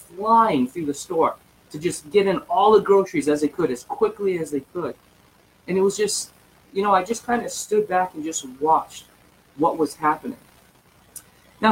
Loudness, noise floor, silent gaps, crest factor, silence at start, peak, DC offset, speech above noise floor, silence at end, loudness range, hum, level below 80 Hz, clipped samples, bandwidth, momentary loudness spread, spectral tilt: -22 LUFS; -56 dBFS; none; 18 dB; 0.1 s; -4 dBFS; under 0.1%; 34 dB; 0 s; 5 LU; none; -60 dBFS; under 0.1%; 16.5 kHz; 19 LU; -4.5 dB/octave